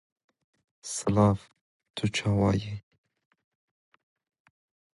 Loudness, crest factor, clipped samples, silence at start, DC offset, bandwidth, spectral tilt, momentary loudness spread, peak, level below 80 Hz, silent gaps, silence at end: -27 LUFS; 22 dB; under 0.1%; 0.85 s; under 0.1%; 11.5 kHz; -6 dB/octave; 18 LU; -10 dBFS; -52 dBFS; 1.61-1.80 s, 1.90-1.94 s; 2.15 s